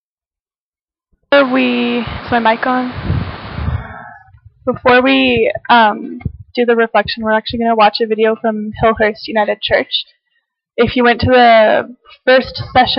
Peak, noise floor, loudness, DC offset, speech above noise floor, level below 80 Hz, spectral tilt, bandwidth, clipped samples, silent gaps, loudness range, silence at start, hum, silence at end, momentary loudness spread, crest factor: 0 dBFS; under -90 dBFS; -13 LUFS; under 0.1%; over 77 dB; -36 dBFS; -9 dB/octave; 5.8 kHz; under 0.1%; none; 3 LU; 1.3 s; none; 0 s; 14 LU; 14 dB